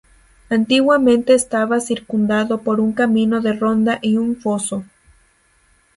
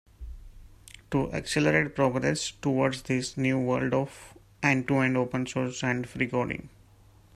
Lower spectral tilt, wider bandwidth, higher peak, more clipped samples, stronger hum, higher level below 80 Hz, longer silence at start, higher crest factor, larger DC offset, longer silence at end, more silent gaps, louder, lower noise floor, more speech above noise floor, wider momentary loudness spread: about the same, -4.5 dB/octave vs -5.5 dB/octave; second, 11.5 kHz vs 14 kHz; first, -2 dBFS vs -8 dBFS; neither; neither; about the same, -54 dBFS vs -52 dBFS; first, 0.5 s vs 0.2 s; about the same, 16 dB vs 20 dB; neither; first, 1.15 s vs 0.65 s; neither; first, -17 LUFS vs -28 LUFS; about the same, -57 dBFS vs -56 dBFS; first, 41 dB vs 29 dB; about the same, 8 LU vs 10 LU